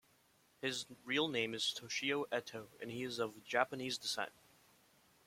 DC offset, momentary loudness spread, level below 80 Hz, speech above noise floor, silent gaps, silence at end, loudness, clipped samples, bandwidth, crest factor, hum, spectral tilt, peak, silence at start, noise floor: under 0.1%; 9 LU; -82 dBFS; 32 dB; none; 0.95 s; -39 LUFS; under 0.1%; 16.5 kHz; 26 dB; none; -2.5 dB/octave; -16 dBFS; 0.6 s; -72 dBFS